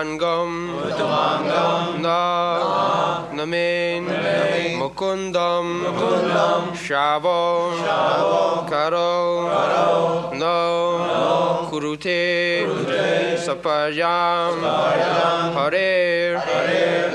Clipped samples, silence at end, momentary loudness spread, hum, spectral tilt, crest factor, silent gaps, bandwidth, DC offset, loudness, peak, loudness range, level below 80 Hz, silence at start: under 0.1%; 0 s; 5 LU; none; -5 dB/octave; 16 dB; none; 11 kHz; under 0.1%; -20 LUFS; -4 dBFS; 2 LU; -58 dBFS; 0 s